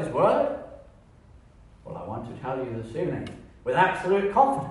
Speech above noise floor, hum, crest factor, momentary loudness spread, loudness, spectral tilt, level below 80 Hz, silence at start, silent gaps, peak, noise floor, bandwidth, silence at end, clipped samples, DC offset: 27 dB; none; 20 dB; 17 LU; -26 LUFS; -7 dB/octave; -54 dBFS; 0 s; none; -8 dBFS; -52 dBFS; 11.5 kHz; 0 s; under 0.1%; under 0.1%